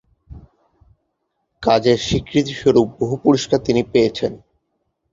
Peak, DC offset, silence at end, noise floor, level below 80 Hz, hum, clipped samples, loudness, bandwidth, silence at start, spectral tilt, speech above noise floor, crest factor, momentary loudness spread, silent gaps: -2 dBFS; under 0.1%; 0.75 s; -72 dBFS; -44 dBFS; none; under 0.1%; -18 LUFS; 7.8 kHz; 0.3 s; -5.5 dB/octave; 56 dB; 18 dB; 6 LU; none